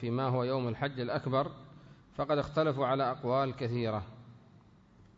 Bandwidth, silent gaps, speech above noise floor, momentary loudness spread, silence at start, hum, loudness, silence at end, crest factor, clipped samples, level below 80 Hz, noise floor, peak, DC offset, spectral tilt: 7.6 kHz; none; 28 dB; 9 LU; 0 s; none; -33 LUFS; 0.8 s; 16 dB; under 0.1%; -62 dBFS; -60 dBFS; -18 dBFS; under 0.1%; -6 dB/octave